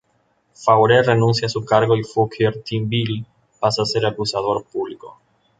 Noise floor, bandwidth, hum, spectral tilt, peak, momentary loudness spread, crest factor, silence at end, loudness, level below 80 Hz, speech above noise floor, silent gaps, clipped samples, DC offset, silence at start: -64 dBFS; 9.2 kHz; none; -5.5 dB/octave; -2 dBFS; 12 LU; 18 dB; 0.5 s; -19 LUFS; -54 dBFS; 46 dB; none; under 0.1%; under 0.1%; 0.6 s